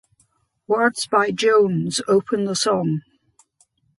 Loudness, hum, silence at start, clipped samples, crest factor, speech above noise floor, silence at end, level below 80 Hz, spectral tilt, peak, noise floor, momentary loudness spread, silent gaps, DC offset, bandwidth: -20 LUFS; none; 0.7 s; under 0.1%; 18 dB; 45 dB; 1 s; -64 dBFS; -4.5 dB/octave; -4 dBFS; -64 dBFS; 7 LU; none; under 0.1%; 11.5 kHz